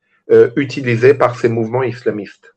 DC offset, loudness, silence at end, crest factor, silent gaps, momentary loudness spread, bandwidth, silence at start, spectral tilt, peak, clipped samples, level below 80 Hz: under 0.1%; -14 LUFS; 0.25 s; 14 dB; none; 10 LU; 8.4 kHz; 0.3 s; -7.5 dB/octave; 0 dBFS; under 0.1%; -58 dBFS